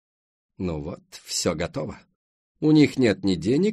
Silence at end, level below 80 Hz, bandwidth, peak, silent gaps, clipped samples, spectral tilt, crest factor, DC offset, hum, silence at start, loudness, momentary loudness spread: 0 s; -52 dBFS; 13 kHz; -6 dBFS; 2.15-2.55 s; under 0.1%; -5.5 dB/octave; 18 dB; under 0.1%; none; 0.6 s; -23 LUFS; 16 LU